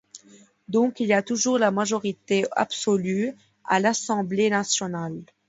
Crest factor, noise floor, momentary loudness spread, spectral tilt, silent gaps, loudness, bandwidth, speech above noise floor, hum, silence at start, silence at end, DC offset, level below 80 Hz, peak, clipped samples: 18 dB; -54 dBFS; 7 LU; -4 dB/octave; none; -24 LUFS; 8 kHz; 30 dB; none; 0.15 s; 0.25 s; under 0.1%; -70 dBFS; -6 dBFS; under 0.1%